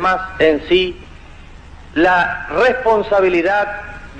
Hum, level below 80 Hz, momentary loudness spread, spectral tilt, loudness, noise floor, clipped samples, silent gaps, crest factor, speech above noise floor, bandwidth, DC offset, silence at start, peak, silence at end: none; -38 dBFS; 10 LU; -5.5 dB/octave; -15 LUFS; -37 dBFS; under 0.1%; none; 14 dB; 22 dB; 8.6 kHz; under 0.1%; 0 s; -2 dBFS; 0 s